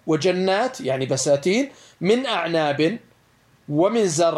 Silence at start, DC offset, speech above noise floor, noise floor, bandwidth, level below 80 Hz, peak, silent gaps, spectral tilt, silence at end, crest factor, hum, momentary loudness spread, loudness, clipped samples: 0.05 s; under 0.1%; 37 dB; -58 dBFS; 13 kHz; -66 dBFS; -6 dBFS; none; -4.5 dB/octave; 0 s; 16 dB; none; 7 LU; -21 LUFS; under 0.1%